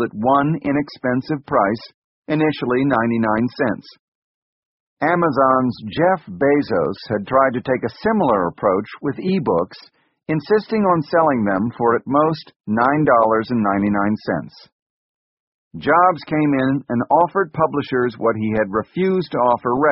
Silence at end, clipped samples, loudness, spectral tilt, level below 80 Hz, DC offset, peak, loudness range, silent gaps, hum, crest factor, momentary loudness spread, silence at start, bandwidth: 0 s; under 0.1%; -18 LUFS; -6 dB/octave; -54 dBFS; under 0.1%; -2 dBFS; 3 LU; 1.94-2.22 s, 3.99-4.97 s, 12.56-12.60 s, 14.72-15.71 s; none; 16 dB; 7 LU; 0 s; 5.8 kHz